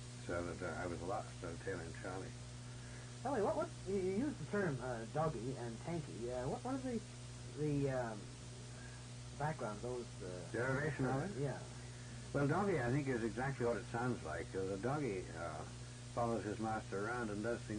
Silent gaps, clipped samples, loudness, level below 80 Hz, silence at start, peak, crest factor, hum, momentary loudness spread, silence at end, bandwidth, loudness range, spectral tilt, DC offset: none; under 0.1%; -42 LUFS; -60 dBFS; 0 s; -26 dBFS; 16 dB; none; 13 LU; 0 s; 10.5 kHz; 4 LU; -6 dB/octave; under 0.1%